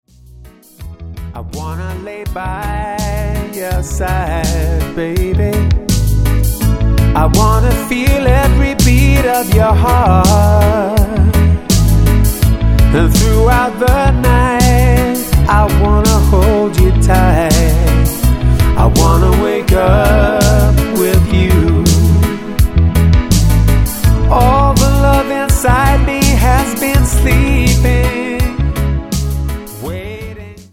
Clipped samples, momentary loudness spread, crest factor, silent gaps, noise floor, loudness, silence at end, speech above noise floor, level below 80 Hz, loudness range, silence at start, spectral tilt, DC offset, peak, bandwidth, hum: under 0.1%; 10 LU; 10 dB; none; -38 dBFS; -12 LUFS; 0.1 s; 27 dB; -14 dBFS; 6 LU; 0.4 s; -6 dB/octave; under 0.1%; 0 dBFS; 17 kHz; none